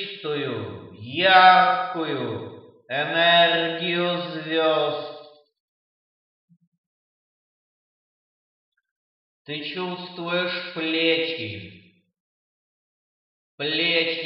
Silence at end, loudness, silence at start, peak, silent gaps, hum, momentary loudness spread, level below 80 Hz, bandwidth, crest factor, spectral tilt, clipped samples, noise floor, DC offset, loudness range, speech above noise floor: 0 s; -21 LUFS; 0 s; -2 dBFS; 5.60-6.48 s, 6.67-6.72 s, 6.78-8.72 s, 8.91-9.45 s, 12.20-13.58 s; none; 17 LU; -78 dBFS; 5.8 kHz; 24 dB; -7.5 dB/octave; under 0.1%; under -90 dBFS; under 0.1%; 15 LU; over 68 dB